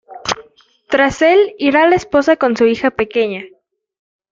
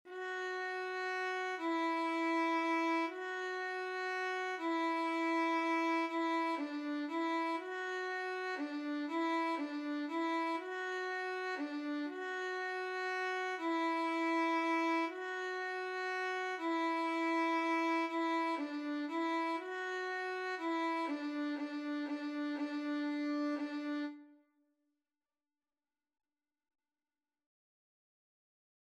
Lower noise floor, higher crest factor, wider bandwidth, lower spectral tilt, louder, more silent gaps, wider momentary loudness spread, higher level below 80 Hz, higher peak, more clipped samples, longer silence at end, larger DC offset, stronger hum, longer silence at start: second, -47 dBFS vs under -90 dBFS; about the same, 14 dB vs 12 dB; second, 7.8 kHz vs 11.5 kHz; first, -4.5 dB/octave vs -2 dB/octave; first, -14 LUFS vs -37 LUFS; neither; first, 11 LU vs 6 LU; first, -48 dBFS vs under -90 dBFS; first, 0 dBFS vs -26 dBFS; neither; second, 0.85 s vs 4.6 s; neither; neither; about the same, 0.1 s vs 0.05 s